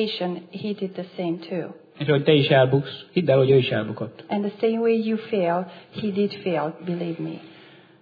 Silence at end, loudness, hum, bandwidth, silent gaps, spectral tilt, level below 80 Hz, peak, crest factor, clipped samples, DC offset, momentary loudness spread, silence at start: 0.5 s; -23 LUFS; none; 5 kHz; none; -9.5 dB/octave; -68 dBFS; -4 dBFS; 18 dB; under 0.1%; under 0.1%; 14 LU; 0 s